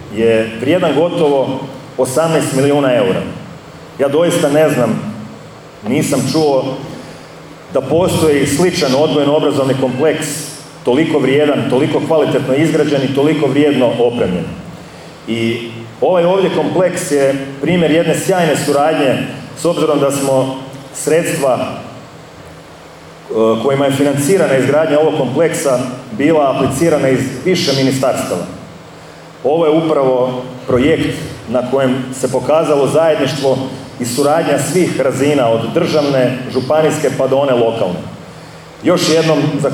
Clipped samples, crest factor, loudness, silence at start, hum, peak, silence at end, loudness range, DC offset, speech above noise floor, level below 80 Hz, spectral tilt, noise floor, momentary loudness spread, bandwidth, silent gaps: under 0.1%; 12 dB; -14 LUFS; 0 s; none; -2 dBFS; 0 s; 3 LU; under 0.1%; 23 dB; -48 dBFS; -5.5 dB/octave; -35 dBFS; 14 LU; 19.5 kHz; none